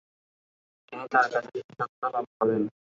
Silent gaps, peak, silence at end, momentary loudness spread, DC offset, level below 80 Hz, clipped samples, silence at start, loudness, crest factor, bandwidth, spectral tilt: 1.64-1.69 s, 1.89-2.02 s, 2.27-2.40 s; -8 dBFS; 0.3 s; 15 LU; under 0.1%; -76 dBFS; under 0.1%; 0.9 s; -28 LUFS; 22 dB; 7.6 kHz; -6.5 dB/octave